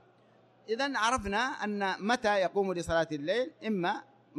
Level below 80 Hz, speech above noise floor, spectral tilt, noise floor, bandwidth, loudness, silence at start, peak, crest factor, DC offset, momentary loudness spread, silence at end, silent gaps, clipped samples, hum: -58 dBFS; 32 dB; -4 dB/octave; -63 dBFS; 12.5 kHz; -31 LUFS; 0.7 s; -14 dBFS; 18 dB; under 0.1%; 5 LU; 0 s; none; under 0.1%; none